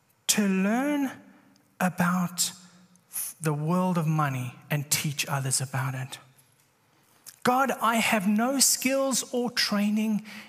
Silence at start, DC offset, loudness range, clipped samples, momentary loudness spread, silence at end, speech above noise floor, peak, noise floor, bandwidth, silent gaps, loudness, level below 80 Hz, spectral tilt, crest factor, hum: 0.3 s; under 0.1%; 5 LU; under 0.1%; 9 LU; 0 s; 38 dB; -8 dBFS; -64 dBFS; 15.5 kHz; none; -26 LUFS; -74 dBFS; -4 dB/octave; 20 dB; none